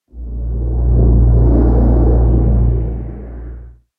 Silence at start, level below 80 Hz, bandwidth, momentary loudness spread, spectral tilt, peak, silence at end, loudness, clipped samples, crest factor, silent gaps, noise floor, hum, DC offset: 0.15 s; -14 dBFS; 1.8 kHz; 18 LU; -14 dB/octave; -2 dBFS; 0.3 s; -14 LUFS; under 0.1%; 12 dB; none; -33 dBFS; none; under 0.1%